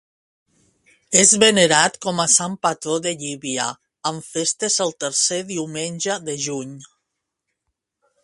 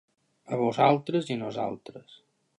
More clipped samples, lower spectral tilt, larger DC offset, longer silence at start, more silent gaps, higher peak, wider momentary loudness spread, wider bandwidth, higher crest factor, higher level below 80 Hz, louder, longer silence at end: neither; second, -2 dB/octave vs -7 dB/octave; neither; first, 1.1 s vs 0.5 s; neither; first, 0 dBFS vs -8 dBFS; about the same, 14 LU vs 15 LU; about the same, 11.5 kHz vs 11 kHz; about the same, 22 dB vs 22 dB; first, -64 dBFS vs -74 dBFS; first, -18 LUFS vs -27 LUFS; first, 1.4 s vs 0.45 s